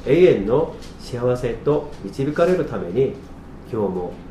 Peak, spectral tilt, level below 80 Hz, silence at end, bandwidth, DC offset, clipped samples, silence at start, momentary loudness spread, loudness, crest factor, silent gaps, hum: -2 dBFS; -7.5 dB/octave; -40 dBFS; 0 s; 12 kHz; under 0.1%; under 0.1%; 0 s; 17 LU; -21 LUFS; 18 dB; none; none